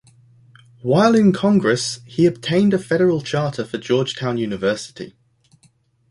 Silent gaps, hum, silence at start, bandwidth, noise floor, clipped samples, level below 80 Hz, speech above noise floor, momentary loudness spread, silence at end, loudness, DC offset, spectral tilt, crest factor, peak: none; none; 0.85 s; 11.5 kHz; -58 dBFS; under 0.1%; -56 dBFS; 40 dB; 12 LU; 1 s; -18 LUFS; under 0.1%; -6 dB/octave; 16 dB; -2 dBFS